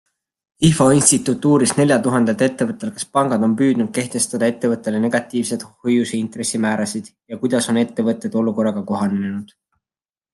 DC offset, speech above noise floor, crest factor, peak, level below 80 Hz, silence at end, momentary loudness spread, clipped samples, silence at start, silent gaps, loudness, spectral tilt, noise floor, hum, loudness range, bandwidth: under 0.1%; over 72 dB; 18 dB; 0 dBFS; -54 dBFS; 0.9 s; 9 LU; under 0.1%; 0.6 s; none; -18 LUFS; -5 dB/octave; under -90 dBFS; none; 5 LU; 12.5 kHz